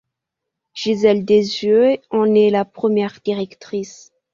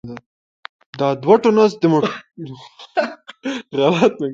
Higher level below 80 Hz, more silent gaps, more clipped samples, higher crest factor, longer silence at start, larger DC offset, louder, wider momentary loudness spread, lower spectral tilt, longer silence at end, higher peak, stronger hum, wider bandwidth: about the same, -60 dBFS vs -62 dBFS; second, none vs 0.26-0.63 s, 0.69-0.79 s, 0.86-0.93 s; neither; about the same, 16 dB vs 18 dB; first, 0.75 s vs 0.05 s; neither; about the same, -17 LUFS vs -17 LUFS; second, 13 LU vs 21 LU; about the same, -6 dB/octave vs -6.5 dB/octave; first, 0.4 s vs 0 s; about the same, -2 dBFS vs 0 dBFS; neither; about the same, 7.4 kHz vs 7.6 kHz